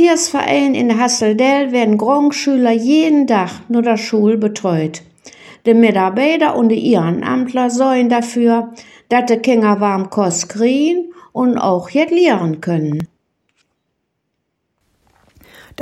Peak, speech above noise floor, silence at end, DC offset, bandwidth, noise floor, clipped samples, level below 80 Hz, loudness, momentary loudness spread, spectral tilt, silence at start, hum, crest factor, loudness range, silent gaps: 0 dBFS; 58 dB; 0 s; under 0.1%; 12.5 kHz; -71 dBFS; under 0.1%; -62 dBFS; -14 LUFS; 6 LU; -5 dB/octave; 0 s; none; 14 dB; 5 LU; none